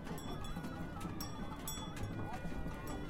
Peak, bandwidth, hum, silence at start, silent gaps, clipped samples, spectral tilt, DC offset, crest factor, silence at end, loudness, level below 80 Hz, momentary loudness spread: -28 dBFS; 16.5 kHz; none; 0 s; none; under 0.1%; -5 dB/octave; under 0.1%; 14 dB; 0 s; -45 LUFS; -50 dBFS; 1 LU